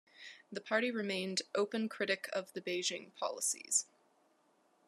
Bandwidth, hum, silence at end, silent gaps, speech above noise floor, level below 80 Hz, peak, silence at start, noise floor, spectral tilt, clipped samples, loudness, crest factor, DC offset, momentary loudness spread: 13.5 kHz; none; 1.05 s; none; 36 dB; under -90 dBFS; -18 dBFS; 0.2 s; -73 dBFS; -2 dB/octave; under 0.1%; -36 LUFS; 20 dB; under 0.1%; 13 LU